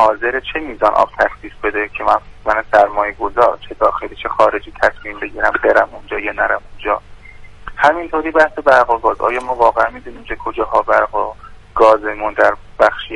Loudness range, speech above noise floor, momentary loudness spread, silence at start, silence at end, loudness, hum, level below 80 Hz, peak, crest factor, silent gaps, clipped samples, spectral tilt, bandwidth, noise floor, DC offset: 2 LU; 20 dB; 11 LU; 0 s; 0 s; -15 LUFS; none; -38 dBFS; 0 dBFS; 16 dB; none; under 0.1%; -5 dB/octave; 11 kHz; -35 dBFS; under 0.1%